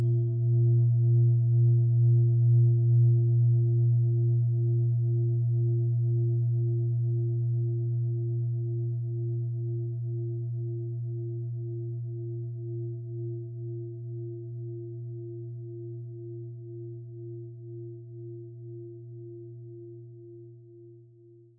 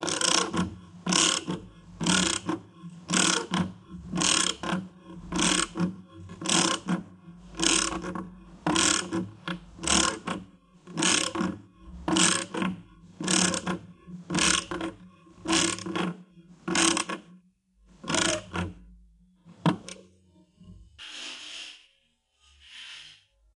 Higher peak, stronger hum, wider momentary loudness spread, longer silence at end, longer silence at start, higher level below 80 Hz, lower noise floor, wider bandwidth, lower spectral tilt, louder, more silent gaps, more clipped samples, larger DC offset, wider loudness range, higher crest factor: second, -16 dBFS vs -6 dBFS; neither; about the same, 20 LU vs 20 LU; first, 0.6 s vs 0.45 s; about the same, 0 s vs 0 s; second, -74 dBFS vs -54 dBFS; second, -55 dBFS vs -70 dBFS; second, 0.7 kHz vs 11.5 kHz; first, -16.5 dB/octave vs -2.5 dB/octave; about the same, -27 LUFS vs -26 LUFS; neither; neither; neither; first, 19 LU vs 10 LU; second, 12 dB vs 24 dB